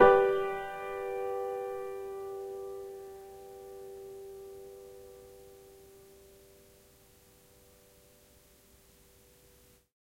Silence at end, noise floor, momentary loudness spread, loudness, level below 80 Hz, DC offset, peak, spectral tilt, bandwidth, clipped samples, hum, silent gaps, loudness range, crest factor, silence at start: 4.05 s; -62 dBFS; 22 LU; -35 LUFS; -62 dBFS; under 0.1%; -8 dBFS; -5.5 dB/octave; 16.5 kHz; under 0.1%; none; none; 21 LU; 26 dB; 0 s